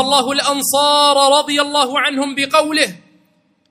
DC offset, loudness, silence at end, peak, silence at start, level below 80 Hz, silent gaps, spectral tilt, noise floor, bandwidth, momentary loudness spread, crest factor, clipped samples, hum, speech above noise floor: under 0.1%; -14 LUFS; 0.75 s; 0 dBFS; 0 s; -64 dBFS; none; -1 dB/octave; -58 dBFS; 16.5 kHz; 6 LU; 16 dB; under 0.1%; none; 44 dB